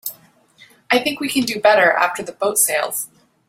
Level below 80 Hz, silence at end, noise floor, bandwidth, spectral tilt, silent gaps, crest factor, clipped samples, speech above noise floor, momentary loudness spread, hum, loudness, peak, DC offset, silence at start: -64 dBFS; 0.4 s; -50 dBFS; 16.5 kHz; -1.5 dB/octave; none; 18 dB; under 0.1%; 33 dB; 12 LU; none; -17 LUFS; -2 dBFS; under 0.1%; 0.05 s